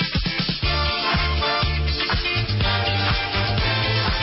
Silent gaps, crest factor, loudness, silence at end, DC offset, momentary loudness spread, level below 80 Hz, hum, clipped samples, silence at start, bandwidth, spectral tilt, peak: none; 12 dB; -21 LUFS; 0 s; under 0.1%; 2 LU; -28 dBFS; none; under 0.1%; 0 s; 5.8 kHz; -8 dB/octave; -10 dBFS